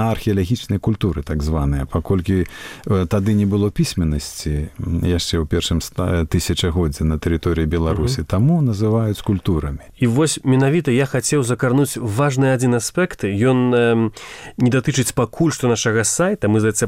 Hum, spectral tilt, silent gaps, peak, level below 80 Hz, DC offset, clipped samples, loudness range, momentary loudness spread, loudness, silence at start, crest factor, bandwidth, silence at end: none; -5.5 dB/octave; none; -6 dBFS; -32 dBFS; under 0.1%; under 0.1%; 3 LU; 6 LU; -19 LUFS; 0 s; 12 dB; 16 kHz; 0 s